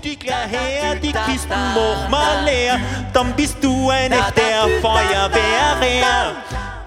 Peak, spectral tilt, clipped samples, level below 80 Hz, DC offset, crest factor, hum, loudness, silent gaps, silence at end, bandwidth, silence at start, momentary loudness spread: 0 dBFS; -4 dB/octave; under 0.1%; -30 dBFS; under 0.1%; 16 dB; none; -17 LUFS; none; 0 s; 16 kHz; 0 s; 6 LU